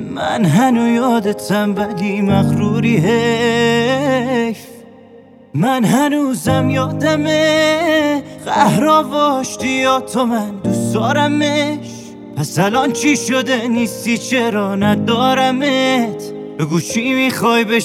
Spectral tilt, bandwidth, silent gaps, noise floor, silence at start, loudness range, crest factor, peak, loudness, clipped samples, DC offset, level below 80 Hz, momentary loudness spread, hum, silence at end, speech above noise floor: -5 dB/octave; 16 kHz; none; -41 dBFS; 0 s; 2 LU; 14 dB; 0 dBFS; -15 LUFS; under 0.1%; under 0.1%; -50 dBFS; 7 LU; none; 0 s; 27 dB